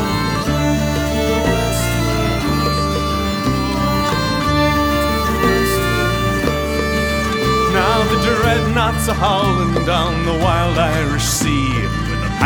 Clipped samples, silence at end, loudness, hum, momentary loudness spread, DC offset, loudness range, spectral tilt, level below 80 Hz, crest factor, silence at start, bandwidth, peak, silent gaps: under 0.1%; 0 s; -16 LUFS; none; 3 LU; under 0.1%; 2 LU; -5 dB/octave; -26 dBFS; 16 dB; 0 s; over 20 kHz; 0 dBFS; none